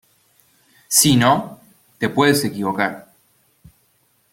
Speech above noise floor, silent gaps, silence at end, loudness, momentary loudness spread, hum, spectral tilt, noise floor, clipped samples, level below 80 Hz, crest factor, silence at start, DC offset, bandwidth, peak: 45 dB; none; 1.3 s; -17 LUFS; 12 LU; none; -3.5 dB/octave; -62 dBFS; under 0.1%; -54 dBFS; 20 dB; 0.9 s; under 0.1%; 16.5 kHz; 0 dBFS